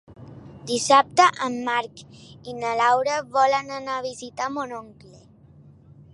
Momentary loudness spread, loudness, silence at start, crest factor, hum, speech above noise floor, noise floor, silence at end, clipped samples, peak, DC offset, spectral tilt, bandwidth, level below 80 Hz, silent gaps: 20 LU; -22 LUFS; 0.1 s; 22 dB; none; 28 dB; -50 dBFS; 1.25 s; under 0.1%; -2 dBFS; under 0.1%; -2.5 dB/octave; 11.5 kHz; -62 dBFS; none